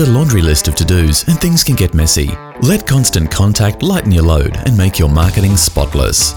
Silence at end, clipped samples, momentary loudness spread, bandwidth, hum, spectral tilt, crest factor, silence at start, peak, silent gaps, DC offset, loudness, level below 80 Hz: 0 s; under 0.1%; 3 LU; over 20 kHz; none; -4.5 dB/octave; 10 dB; 0 s; 0 dBFS; none; 0.3%; -12 LUFS; -20 dBFS